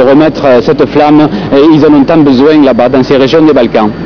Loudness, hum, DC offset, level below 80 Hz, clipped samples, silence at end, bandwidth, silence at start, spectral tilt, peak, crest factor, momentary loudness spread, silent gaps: -5 LUFS; none; 2%; -34 dBFS; 10%; 0 s; 5.4 kHz; 0 s; -7.5 dB/octave; 0 dBFS; 4 dB; 3 LU; none